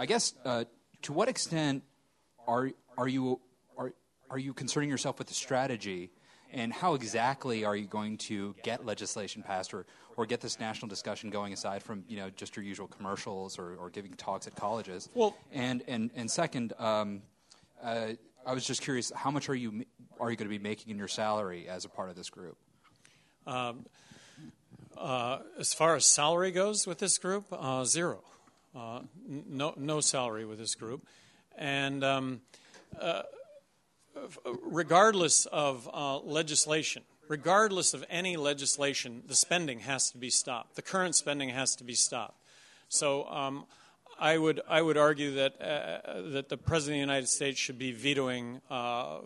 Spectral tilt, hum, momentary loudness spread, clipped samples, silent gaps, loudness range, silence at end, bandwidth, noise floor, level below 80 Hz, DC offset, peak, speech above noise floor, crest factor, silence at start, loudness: -2.5 dB/octave; none; 16 LU; under 0.1%; none; 10 LU; 0 s; 12 kHz; -71 dBFS; -70 dBFS; under 0.1%; -10 dBFS; 38 dB; 24 dB; 0 s; -32 LUFS